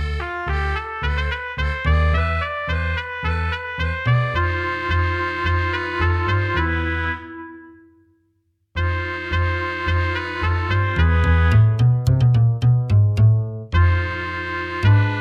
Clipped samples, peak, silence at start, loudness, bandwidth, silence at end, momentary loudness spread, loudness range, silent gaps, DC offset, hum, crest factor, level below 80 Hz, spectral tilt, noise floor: under 0.1%; -4 dBFS; 0 s; -20 LUFS; 7.2 kHz; 0 s; 8 LU; 8 LU; none; under 0.1%; none; 14 dB; -28 dBFS; -7.5 dB/octave; -67 dBFS